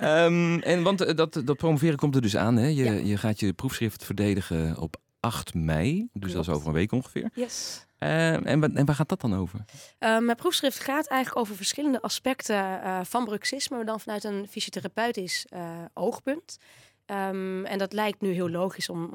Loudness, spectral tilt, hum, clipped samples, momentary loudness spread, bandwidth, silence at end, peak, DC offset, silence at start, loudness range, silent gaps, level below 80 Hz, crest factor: -27 LUFS; -5.5 dB/octave; none; under 0.1%; 9 LU; 18 kHz; 0 s; -10 dBFS; under 0.1%; 0 s; 6 LU; none; -54 dBFS; 18 dB